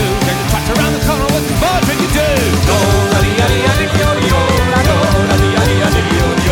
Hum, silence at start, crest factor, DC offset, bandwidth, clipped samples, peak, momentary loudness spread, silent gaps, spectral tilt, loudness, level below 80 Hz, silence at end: none; 0 s; 12 dB; under 0.1%; 18.5 kHz; under 0.1%; 0 dBFS; 3 LU; none; -5 dB/octave; -12 LUFS; -22 dBFS; 0 s